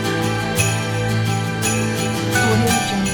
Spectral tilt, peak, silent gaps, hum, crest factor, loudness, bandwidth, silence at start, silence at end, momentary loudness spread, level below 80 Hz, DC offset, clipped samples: -4.5 dB/octave; -4 dBFS; none; none; 16 dB; -19 LUFS; 19 kHz; 0 s; 0 s; 4 LU; -42 dBFS; under 0.1%; under 0.1%